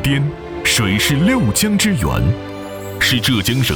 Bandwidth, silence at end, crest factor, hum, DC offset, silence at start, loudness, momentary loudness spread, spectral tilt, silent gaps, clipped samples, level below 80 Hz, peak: over 20 kHz; 0 s; 12 dB; none; under 0.1%; 0 s; -15 LUFS; 10 LU; -4 dB/octave; none; under 0.1%; -32 dBFS; -4 dBFS